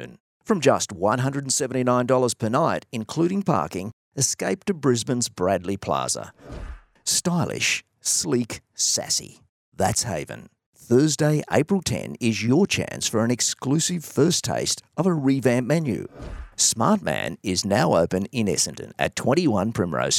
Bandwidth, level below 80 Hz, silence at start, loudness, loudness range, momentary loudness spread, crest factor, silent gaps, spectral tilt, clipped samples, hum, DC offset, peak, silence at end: 17 kHz; -50 dBFS; 0 s; -23 LUFS; 2 LU; 9 LU; 20 dB; 0.20-0.40 s, 3.93-4.12 s, 9.49-9.72 s, 10.66-10.73 s; -4 dB/octave; under 0.1%; none; under 0.1%; -2 dBFS; 0 s